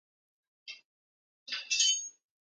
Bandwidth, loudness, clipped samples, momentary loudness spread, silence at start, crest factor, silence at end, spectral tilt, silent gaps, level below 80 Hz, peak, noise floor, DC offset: 10.5 kHz; -29 LUFS; under 0.1%; 22 LU; 0.65 s; 24 dB; 0.45 s; 6.5 dB/octave; 0.85-1.46 s; under -90 dBFS; -14 dBFS; under -90 dBFS; under 0.1%